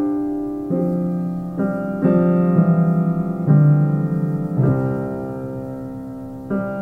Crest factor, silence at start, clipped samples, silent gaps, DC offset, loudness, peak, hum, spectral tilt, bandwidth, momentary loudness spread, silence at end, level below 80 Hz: 16 dB; 0 s; under 0.1%; none; under 0.1%; -19 LUFS; -2 dBFS; none; -12 dB/octave; 2.8 kHz; 14 LU; 0 s; -48 dBFS